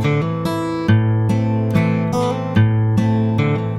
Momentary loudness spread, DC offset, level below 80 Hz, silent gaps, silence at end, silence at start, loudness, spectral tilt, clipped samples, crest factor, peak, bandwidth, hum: 4 LU; under 0.1%; -42 dBFS; none; 0 s; 0 s; -17 LUFS; -8 dB/octave; under 0.1%; 14 dB; -2 dBFS; 11.5 kHz; none